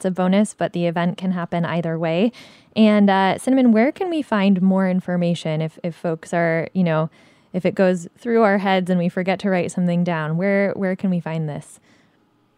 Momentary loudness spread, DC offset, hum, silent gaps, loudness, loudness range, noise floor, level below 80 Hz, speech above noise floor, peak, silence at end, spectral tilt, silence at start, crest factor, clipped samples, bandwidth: 9 LU; under 0.1%; none; none; -20 LUFS; 4 LU; -60 dBFS; -66 dBFS; 41 dB; -4 dBFS; 0.95 s; -7 dB/octave; 0 s; 16 dB; under 0.1%; 11.5 kHz